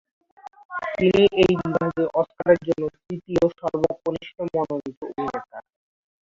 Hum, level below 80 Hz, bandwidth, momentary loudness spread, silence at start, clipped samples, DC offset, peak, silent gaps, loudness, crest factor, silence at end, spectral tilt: none; -52 dBFS; 7.6 kHz; 16 LU; 0.45 s; under 0.1%; under 0.1%; -4 dBFS; 0.65-0.69 s, 4.97-5.01 s; -23 LUFS; 20 dB; 0.7 s; -7 dB/octave